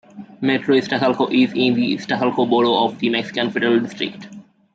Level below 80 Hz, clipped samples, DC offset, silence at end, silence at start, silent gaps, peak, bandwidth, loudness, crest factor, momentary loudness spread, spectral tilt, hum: -66 dBFS; under 0.1%; under 0.1%; 0.35 s; 0.15 s; none; -4 dBFS; 7.6 kHz; -19 LUFS; 14 dB; 8 LU; -6 dB/octave; none